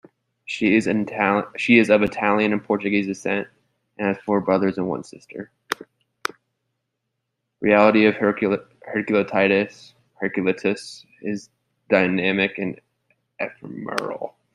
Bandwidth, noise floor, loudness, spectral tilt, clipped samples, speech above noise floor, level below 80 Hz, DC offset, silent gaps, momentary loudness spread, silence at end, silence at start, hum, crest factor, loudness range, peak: 13.5 kHz; -78 dBFS; -21 LUFS; -6 dB/octave; under 0.1%; 58 dB; -62 dBFS; under 0.1%; none; 15 LU; 0.25 s; 0.5 s; none; 20 dB; 6 LU; -2 dBFS